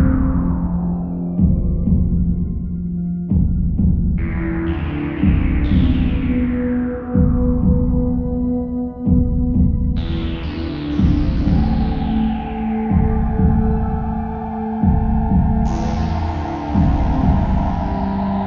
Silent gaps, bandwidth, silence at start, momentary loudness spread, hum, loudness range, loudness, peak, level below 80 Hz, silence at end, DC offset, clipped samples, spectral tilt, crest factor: none; 6.6 kHz; 0 s; 6 LU; none; 2 LU; -19 LUFS; -2 dBFS; -22 dBFS; 0 s; under 0.1%; under 0.1%; -9.5 dB/octave; 14 dB